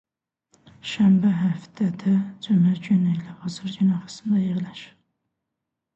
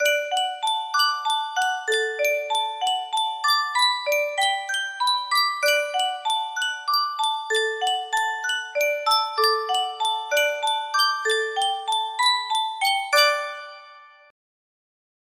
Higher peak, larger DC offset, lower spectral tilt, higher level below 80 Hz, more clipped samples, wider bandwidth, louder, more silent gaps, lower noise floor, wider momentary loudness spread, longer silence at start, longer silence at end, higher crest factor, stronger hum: second, -10 dBFS vs -6 dBFS; neither; first, -7.5 dB/octave vs 3 dB/octave; first, -64 dBFS vs -76 dBFS; neither; second, 8.2 kHz vs 16 kHz; about the same, -23 LUFS vs -22 LUFS; neither; first, -83 dBFS vs -48 dBFS; first, 14 LU vs 5 LU; first, 0.85 s vs 0 s; second, 1.1 s vs 1.25 s; about the same, 14 dB vs 18 dB; neither